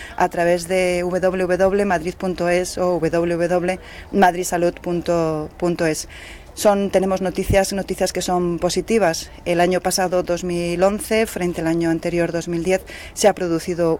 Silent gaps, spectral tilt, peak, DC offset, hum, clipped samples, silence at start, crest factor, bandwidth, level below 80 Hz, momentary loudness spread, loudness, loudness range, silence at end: none; -5 dB/octave; -4 dBFS; under 0.1%; none; under 0.1%; 0 s; 14 dB; 17 kHz; -40 dBFS; 6 LU; -20 LUFS; 1 LU; 0 s